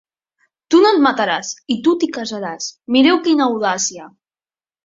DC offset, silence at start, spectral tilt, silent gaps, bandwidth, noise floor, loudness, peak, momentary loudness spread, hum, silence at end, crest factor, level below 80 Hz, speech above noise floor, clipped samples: under 0.1%; 0.7 s; -3 dB/octave; none; 7.8 kHz; under -90 dBFS; -16 LUFS; -2 dBFS; 12 LU; none; 0.75 s; 16 dB; -62 dBFS; over 74 dB; under 0.1%